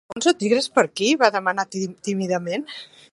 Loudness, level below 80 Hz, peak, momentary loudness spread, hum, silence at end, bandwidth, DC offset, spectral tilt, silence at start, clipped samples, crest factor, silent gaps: -21 LUFS; -70 dBFS; 0 dBFS; 10 LU; none; 0.3 s; 11.5 kHz; under 0.1%; -4 dB/octave; 0.1 s; under 0.1%; 22 dB; none